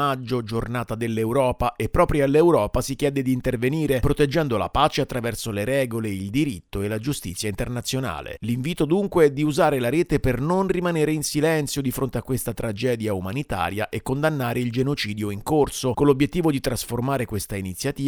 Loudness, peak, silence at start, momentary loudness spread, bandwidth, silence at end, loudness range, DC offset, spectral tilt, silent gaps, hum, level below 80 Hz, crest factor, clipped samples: -23 LUFS; -4 dBFS; 0 s; 8 LU; over 20 kHz; 0 s; 4 LU; under 0.1%; -5.5 dB/octave; none; none; -38 dBFS; 18 dB; under 0.1%